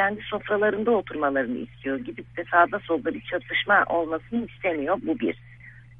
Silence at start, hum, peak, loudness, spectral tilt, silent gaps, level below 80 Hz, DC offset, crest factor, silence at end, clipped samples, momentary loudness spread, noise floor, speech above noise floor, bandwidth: 0 s; none; -6 dBFS; -25 LUFS; -8 dB/octave; none; -56 dBFS; under 0.1%; 20 dB; 0.05 s; under 0.1%; 11 LU; -47 dBFS; 22 dB; 3.9 kHz